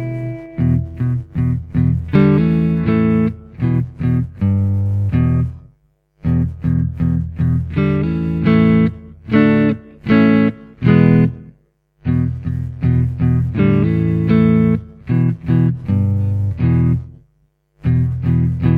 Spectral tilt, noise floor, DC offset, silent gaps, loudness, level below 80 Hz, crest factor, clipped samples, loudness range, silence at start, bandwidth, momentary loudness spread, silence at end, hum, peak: -10.5 dB/octave; -60 dBFS; under 0.1%; none; -16 LUFS; -32 dBFS; 16 dB; under 0.1%; 4 LU; 0 s; 4.8 kHz; 9 LU; 0 s; none; 0 dBFS